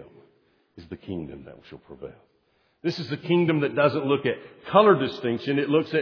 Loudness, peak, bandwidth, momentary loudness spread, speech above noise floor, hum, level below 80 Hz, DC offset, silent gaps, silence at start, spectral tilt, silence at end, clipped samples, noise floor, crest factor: -24 LUFS; -2 dBFS; 5.4 kHz; 23 LU; 40 dB; none; -62 dBFS; under 0.1%; none; 0 s; -8 dB/octave; 0 s; under 0.1%; -64 dBFS; 22 dB